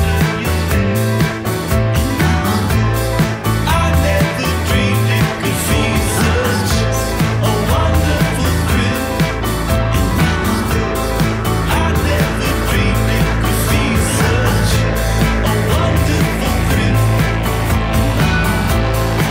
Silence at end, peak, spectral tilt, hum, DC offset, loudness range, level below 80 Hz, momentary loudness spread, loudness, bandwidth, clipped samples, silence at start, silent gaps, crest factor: 0 s; -4 dBFS; -5.5 dB/octave; none; under 0.1%; 1 LU; -22 dBFS; 3 LU; -15 LUFS; 16.5 kHz; under 0.1%; 0 s; none; 10 dB